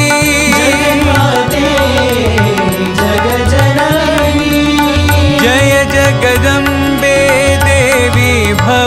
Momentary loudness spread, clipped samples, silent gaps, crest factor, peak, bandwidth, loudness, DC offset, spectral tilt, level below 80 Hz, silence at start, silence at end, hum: 3 LU; under 0.1%; none; 10 dB; 0 dBFS; 16.5 kHz; -9 LUFS; under 0.1%; -4.5 dB/octave; -24 dBFS; 0 s; 0 s; none